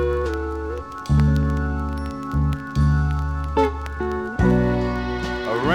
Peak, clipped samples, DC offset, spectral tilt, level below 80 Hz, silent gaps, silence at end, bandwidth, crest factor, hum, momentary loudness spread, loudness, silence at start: -6 dBFS; under 0.1%; under 0.1%; -8 dB/octave; -28 dBFS; none; 0 s; 9.8 kHz; 16 dB; none; 9 LU; -23 LUFS; 0 s